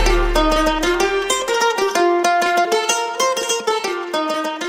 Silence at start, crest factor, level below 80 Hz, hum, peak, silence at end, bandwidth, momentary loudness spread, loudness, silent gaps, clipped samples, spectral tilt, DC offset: 0 s; 14 dB; -28 dBFS; none; -2 dBFS; 0 s; 16 kHz; 5 LU; -17 LUFS; none; under 0.1%; -2.5 dB/octave; under 0.1%